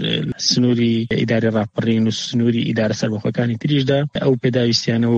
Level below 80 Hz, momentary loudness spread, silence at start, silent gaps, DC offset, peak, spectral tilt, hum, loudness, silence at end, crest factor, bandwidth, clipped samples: -52 dBFS; 4 LU; 0 s; none; under 0.1%; -2 dBFS; -5.5 dB/octave; none; -18 LUFS; 0 s; 16 dB; 8 kHz; under 0.1%